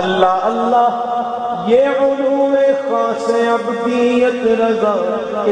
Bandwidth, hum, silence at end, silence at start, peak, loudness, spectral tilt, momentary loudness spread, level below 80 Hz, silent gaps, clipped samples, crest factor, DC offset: 9.8 kHz; none; 0 s; 0 s; 0 dBFS; -15 LUFS; -5.5 dB/octave; 6 LU; -56 dBFS; none; under 0.1%; 14 dB; under 0.1%